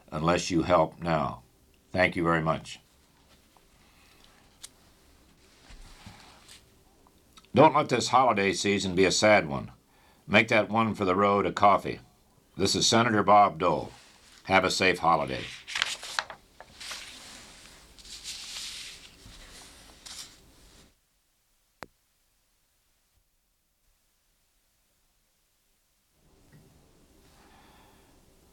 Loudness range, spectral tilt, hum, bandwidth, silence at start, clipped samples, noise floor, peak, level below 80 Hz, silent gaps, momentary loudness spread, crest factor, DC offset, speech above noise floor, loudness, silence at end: 18 LU; -4 dB/octave; none; 16.5 kHz; 0.1 s; under 0.1%; -73 dBFS; -4 dBFS; -58 dBFS; none; 26 LU; 24 dB; under 0.1%; 48 dB; -25 LUFS; 8.25 s